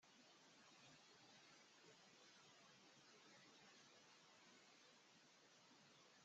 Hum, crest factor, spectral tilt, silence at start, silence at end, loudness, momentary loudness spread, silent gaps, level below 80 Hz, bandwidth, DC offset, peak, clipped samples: none; 14 dB; -1 dB/octave; 0 s; 0 s; -68 LUFS; 2 LU; none; under -90 dBFS; 8 kHz; under 0.1%; -56 dBFS; under 0.1%